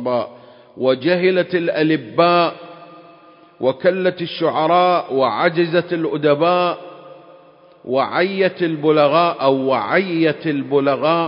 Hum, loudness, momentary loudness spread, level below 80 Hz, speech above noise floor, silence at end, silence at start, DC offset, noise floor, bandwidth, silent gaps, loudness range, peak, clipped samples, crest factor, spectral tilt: none; -17 LUFS; 7 LU; -70 dBFS; 30 dB; 0 s; 0 s; under 0.1%; -47 dBFS; 5.4 kHz; none; 2 LU; 0 dBFS; under 0.1%; 18 dB; -10.5 dB/octave